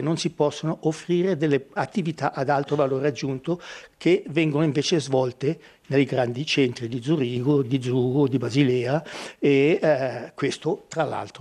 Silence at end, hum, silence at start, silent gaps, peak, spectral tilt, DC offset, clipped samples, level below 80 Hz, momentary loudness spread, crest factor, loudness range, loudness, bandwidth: 0 s; none; 0 s; none; -6 dBFS; -6 dB/octave; under 0.1%; under 0.1%; -64 dBFS; 7 LU; 16 dB; 2 LU; -24 LUFS; 11.5 kHz